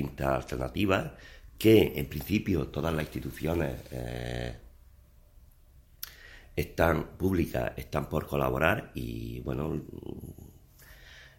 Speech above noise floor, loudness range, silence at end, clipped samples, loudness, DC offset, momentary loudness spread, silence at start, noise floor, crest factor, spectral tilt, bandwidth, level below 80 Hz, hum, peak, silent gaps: 27 dB; 9 LU; 0.1 s; under 0.1%; -30 LUFS; under 0.1%; 17 LU; 0 s; -57 dBFS; 24 dB; -6.5 dB/octave; 16.5 kHz; -46 dBFS; none; -8 dBFS; none